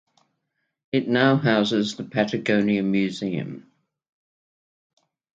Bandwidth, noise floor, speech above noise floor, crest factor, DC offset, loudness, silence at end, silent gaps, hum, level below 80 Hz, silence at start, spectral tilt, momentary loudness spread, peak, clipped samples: 7.8 kHz; -77 dBFS; 55 dB; 20 dB; under 0.1%; -22 LUFS; 1.75 s; none; none; -66 dBFS; 0.95 s; -6 dB/octave; 10 LU; -4 dBFS; under 0.1%